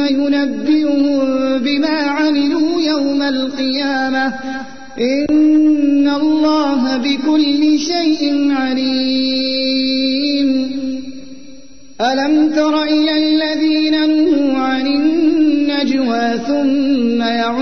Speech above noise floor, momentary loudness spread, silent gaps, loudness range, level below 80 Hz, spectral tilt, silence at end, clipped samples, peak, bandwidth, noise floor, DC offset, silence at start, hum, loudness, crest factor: 27 dB; 5 LU; none; 3 LU; -52 dBFS; -4 dB/octave; 0 s; under 0.1%; -4 dBFS; 6.6 kHz; -41 dBFS; 2%; 0 s; none; -15 LUFS; 10 dB